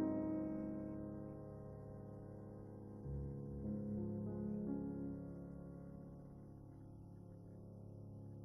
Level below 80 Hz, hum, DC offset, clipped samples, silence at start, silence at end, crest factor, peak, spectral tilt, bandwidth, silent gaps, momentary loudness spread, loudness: -62 dBFS; none; under 0.1%; under 0.1%; 0 s; 0 s; 18 dB; -30 dBFS; -11.5 dB/octave; 11 kHz; none; 14 LU; -49 LUFS